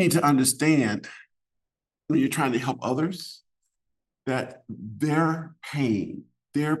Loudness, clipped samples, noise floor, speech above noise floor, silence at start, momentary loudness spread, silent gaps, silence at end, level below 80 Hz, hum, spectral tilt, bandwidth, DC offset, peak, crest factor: -25 LUFS; under 0.1%; -86 dBFS; 61 dB; 0 s; 17 LU; none; 0 s; -68 dBFS; none; -5 dB/octave; 13 kHz; under 0.1%; -8 dBFS; 18 dB